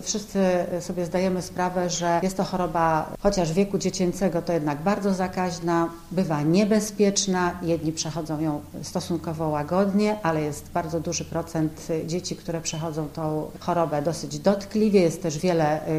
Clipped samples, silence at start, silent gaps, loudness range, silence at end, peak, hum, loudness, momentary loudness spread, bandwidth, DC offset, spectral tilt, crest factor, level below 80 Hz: under 0.1%; 0 s; none; 4 LU; 0 s; -8 dBFS; none; -25 LUFS; 8 LU; 15.5 kHz; under 0.1%; -5.5 dB/octave; 16 dB; -48 dBFS